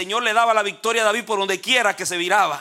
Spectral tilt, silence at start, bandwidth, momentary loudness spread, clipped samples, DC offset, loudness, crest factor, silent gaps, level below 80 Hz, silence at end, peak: -1.5 dB/octave; 0 s; 16.5 kHz; 4 LU; under 0.1%; under 0.1%; -19 LUFS; 16 dB; none; -70 dBFS; 0 s; -4 dBFS